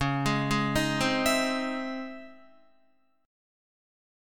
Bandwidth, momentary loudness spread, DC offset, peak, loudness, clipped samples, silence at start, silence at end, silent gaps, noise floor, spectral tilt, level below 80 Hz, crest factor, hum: 19 kHz; 13 LU; 0.3%; -12 dBFS; -27 LUFS; under 0.1%; 0 s; 1 s; none; -69 dBFS; -4.5 dB/octave; -50 dBFS; 18 dB; none